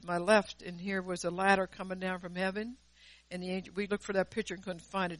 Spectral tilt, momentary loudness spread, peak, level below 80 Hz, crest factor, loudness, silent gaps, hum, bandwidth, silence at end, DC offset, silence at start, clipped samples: -5 dB/octave; 13 LU; -12 dBFS; -62 dBFS; 22 dB; -34 LUFS; none; none; 11.5 kHz; 0 s; under 0.1%; 0 s; under 0.1%